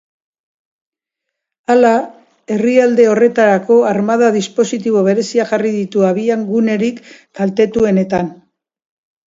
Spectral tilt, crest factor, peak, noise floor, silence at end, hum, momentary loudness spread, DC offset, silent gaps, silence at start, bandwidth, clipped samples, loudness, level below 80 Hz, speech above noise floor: -6 dB/octave; 14 dB; 0 dBFS; -79 dBFS; 0.95 s; none; 9 LU; under 0.1%; none; 1.7 s; 7.8 kHz; under 0.1%; -13 LUFS; -56 dBFS; 66 dB